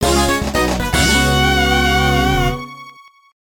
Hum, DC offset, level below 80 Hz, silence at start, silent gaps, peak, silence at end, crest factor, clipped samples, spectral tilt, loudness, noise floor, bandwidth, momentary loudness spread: none; under 0.1%; -24 dBFS; 0 s; none; -2 dBFS; 0.6 s; 14 dB; under 0.1%; -4 dB/octave; -14 LUFS; -42 dBFS; 17.5 kHz; 6 LU